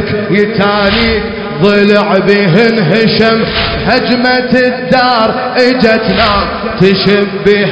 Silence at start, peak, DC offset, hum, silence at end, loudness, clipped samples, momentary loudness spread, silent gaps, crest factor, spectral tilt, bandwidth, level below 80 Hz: 0 s; 0 dBFS; 0.2%; none; 0 s; -9 LUFS; 1%; 4 LU; none; 10 dB; -7 dB/octave; 8 kHz; -30 dBFS